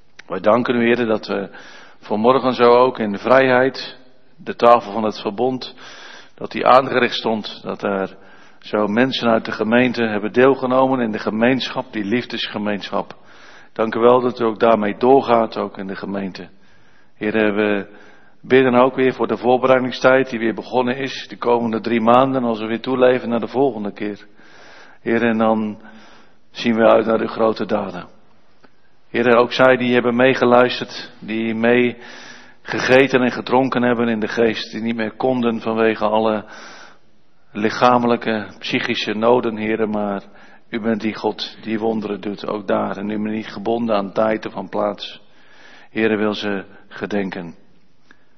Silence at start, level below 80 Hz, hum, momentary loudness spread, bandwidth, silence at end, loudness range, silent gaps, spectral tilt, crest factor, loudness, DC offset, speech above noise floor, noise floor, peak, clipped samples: 0.3 s; -60 dBFS; none; 15 LU; 6.4 kHz; 0.85 s; 6 LU; none; -6 dB/octave; 18 dB; -18 LUFS; 0.7%; 42 dB; -59 dBFS; 0 dBFS; under 0.1%